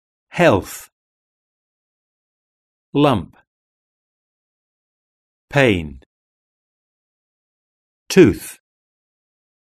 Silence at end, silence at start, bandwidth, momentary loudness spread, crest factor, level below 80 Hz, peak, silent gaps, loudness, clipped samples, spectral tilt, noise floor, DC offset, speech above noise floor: 1.1 s; 0.35 s; 13.5 kHz; 21 LU; 22 dB; -48 dBFS; 0 dBFS; 0.92-2.93 s, 3.47-5.48 s, 6.06-8.06 s; -16 LUFS; under 0.1%; -6 dB/octave; under -90 dBFS; under 0.1%; over 75 dB